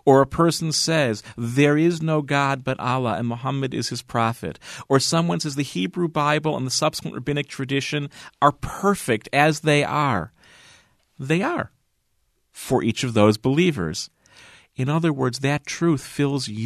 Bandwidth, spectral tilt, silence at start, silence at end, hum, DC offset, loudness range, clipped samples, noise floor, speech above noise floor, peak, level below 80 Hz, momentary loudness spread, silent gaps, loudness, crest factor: 13.5 kHz; -5 dB/octave; 0.05 s; 0 s; none; under 0.1%; 2 LU; under 0.1%; -68 dBFS; 47 dB; -2 dBFS; -52 dBFS; 10 LU; none; -22 LUFS; 20 dB